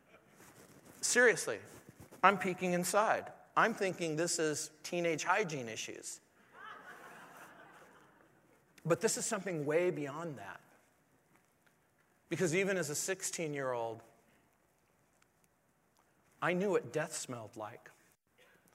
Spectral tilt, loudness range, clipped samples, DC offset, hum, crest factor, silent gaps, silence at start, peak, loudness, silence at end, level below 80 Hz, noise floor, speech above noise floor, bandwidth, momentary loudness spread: -3.5 dB/octave; 9 LU; under 0.1%; under 0.1%; none; 28 dB; none; 0.4 s; -10 dBFS; -34 LUFS; 0.85 s; -82 dBFS; -74 dBFS; 40 dB; 16 kHz; 22 LU